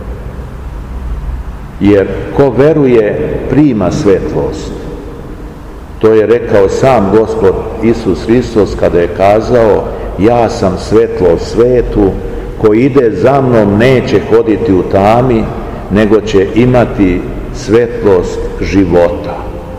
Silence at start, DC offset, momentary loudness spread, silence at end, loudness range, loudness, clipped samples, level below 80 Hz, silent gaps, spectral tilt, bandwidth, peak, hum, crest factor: 0 s; 0.8%; 15 LU; 0 s; 3 LU; -9 LUFS; 3%; -24 dBFS; none; -7.5 dB/octave; 11.5 kHz; 0 dBFS; none; 10 dB